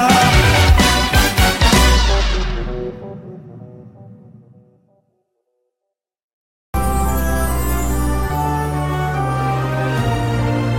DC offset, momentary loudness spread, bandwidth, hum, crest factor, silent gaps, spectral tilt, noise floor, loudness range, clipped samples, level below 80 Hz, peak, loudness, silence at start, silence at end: under 0.1%; 16 LU; 17 kHz; none; 16 dB; 6.23-6.73 s; -4.5 dB/octave; -80 dBFS; 16 LU; under 0.1%; -22 dBFS; 0 dBFS; -16 LUFS; 0 s; 0 s